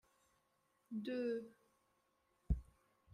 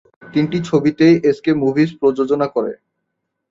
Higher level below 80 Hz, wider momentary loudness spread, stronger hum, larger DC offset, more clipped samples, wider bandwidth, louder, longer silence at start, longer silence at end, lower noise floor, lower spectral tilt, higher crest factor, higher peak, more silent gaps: about the same, -52 dBFS vs -56 dBFS; about the same, 8 LU vs 9 LU; neither; neither; neither; first, 11 kHz vs 7.6 kHz; second, -45 LUFS vs -16 LUFS; first, 0.9 s vs 0.25 s; second, 0.5 s vs 0.75 s; first, -81 dBFS vs -75 dBFS; about the same, -8.5 dB/octave vs -7.5 dB/octave; first, 22 dB vs 14 dB; second, -24 dBFS vs -2 dBFS; neither